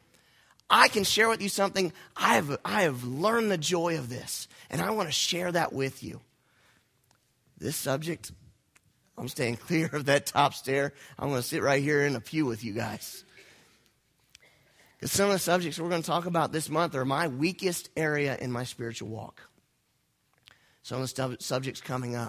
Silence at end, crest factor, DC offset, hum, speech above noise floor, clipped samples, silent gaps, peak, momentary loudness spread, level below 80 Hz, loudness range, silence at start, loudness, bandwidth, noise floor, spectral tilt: 0 s; 26 dB; under 0.1%; none; 44 dB; under 0.1%; none; -4 dBFS; 14 LU; -64 dBFS; 10 LU; 0.7 s; -28 LUFS; 16 kHz; -73 dBFS; -4 dB/octave